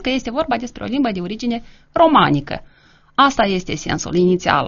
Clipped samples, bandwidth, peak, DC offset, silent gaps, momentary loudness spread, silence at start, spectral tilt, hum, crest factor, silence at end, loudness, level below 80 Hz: under 0.1%; 7.2 kHz; 0 dBFS; under 0.1%; none; 11 LU; 0 s; -4 dB/octave; none; 18 dB; 0 s; -18 LUFS; -42 dBFS